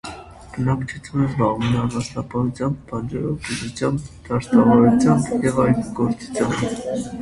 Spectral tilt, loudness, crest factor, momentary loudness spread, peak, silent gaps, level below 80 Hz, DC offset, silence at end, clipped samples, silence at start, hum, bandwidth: -7 dB/octave; -20 LUFS; 18 dB; 12 LU; -2 dBFS; none; -44 dBFS; under 0.1%; 0 s; under 0.1%; 0.05 s; none; 11.5 kHz